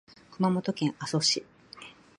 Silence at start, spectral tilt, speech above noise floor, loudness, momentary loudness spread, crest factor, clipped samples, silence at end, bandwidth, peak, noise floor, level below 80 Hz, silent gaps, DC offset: 0.3 s; -4 dB/octave; 22 dB; -28 LUFS; 21 LU; 18 dB; under 0.1%; 0.25 s; 11.5 kHz; -12 dBFS; -50 dBFS; -72 dBFS; none; under 0.1%